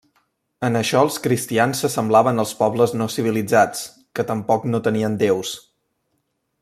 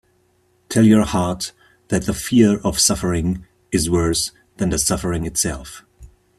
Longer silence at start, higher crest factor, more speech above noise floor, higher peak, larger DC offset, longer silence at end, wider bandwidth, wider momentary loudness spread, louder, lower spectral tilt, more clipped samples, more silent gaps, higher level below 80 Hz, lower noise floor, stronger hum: about the same, 0.6 s vs 0.7 s; about the same, 18 dB vs 18 dB; first, 52 dB vs 43 dB; about the same, -2 dBFS vs -2 dBFS; neither; first, 1 s vs 0.35 s; about the same, 15.5 kHz vs 15 kHz; second, 9 LU vs 12 LU; about the same, -20 LUFS vs -18 LUFS; about the same, -5 dB/octave vs -4.5 dB/octave; neither; neither; second, -62 dBFS vs -40 dBFS; first, -71 dBFS vs -61 dBFS; neither